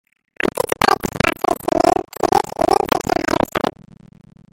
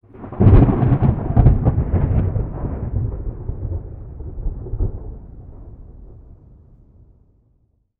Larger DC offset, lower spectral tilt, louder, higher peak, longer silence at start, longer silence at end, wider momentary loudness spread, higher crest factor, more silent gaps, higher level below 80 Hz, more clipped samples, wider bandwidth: neither; second, -4.5 dB/octave vs -13.5 dB/octave; about the same, -18 LUFS vs -19 LUFS; about the same, 0 dBFS vs 0 dBFS; first, 0.45 s vs 0.15 s; second, 0.8 s vs 1.8 s; second, 6 LU vs 22 LU; about the same, 20 dB vs 18 dB; neither; second, -42 dBFS vs -24 dBFS; neither; first, 17 kHz vs 3.4 kHz